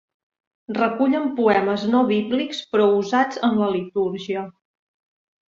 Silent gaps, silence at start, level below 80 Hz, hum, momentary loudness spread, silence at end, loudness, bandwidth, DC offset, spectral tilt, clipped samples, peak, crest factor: none; 0.7 s; -66 dBFS; none; 9 LU; 1 s; -21 LUFS; 7.4 kHz; under 0.1%; -6 dB/octave; under 0.1%; -4 dBFS; 18 dB